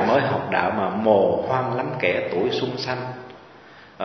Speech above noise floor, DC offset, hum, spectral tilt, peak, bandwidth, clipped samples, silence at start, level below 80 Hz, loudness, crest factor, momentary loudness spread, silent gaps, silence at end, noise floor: 25 dB; under 0.1%; none; -7 dB/octave; -4 dBFS; 6.4 kHz; under 0.1%; 0 s; -56 dBFS; -22 LUFS; 18 dB; 11 LU; none; 0 s; -46 dBFS